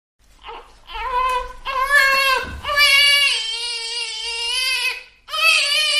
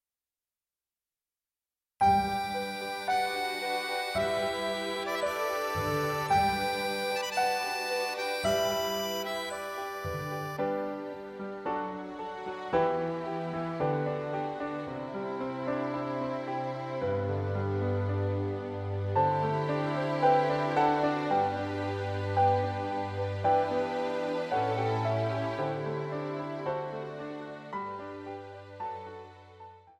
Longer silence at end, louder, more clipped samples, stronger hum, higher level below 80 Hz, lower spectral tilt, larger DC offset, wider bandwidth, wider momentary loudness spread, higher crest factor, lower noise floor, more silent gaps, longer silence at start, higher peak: about the same, 0 s vs 0.1 s; first, -16 LUFS vs -31 LUFS; neither; neither; first, -44 dBFS vs -60 dBFS; second, 1 dB/octave vs -5.5 dB/octave; neither; about the same, 15.5 kHz vs 16.5 kHz; about the same, 13 LU vs 12 LU; about the same, 18 dB vs 18 dB; second, -38 dBFS vs under -90 dBFS; neither; second, 0.45 s vs 2 s; first, -2 dBFS vs -14 dBFS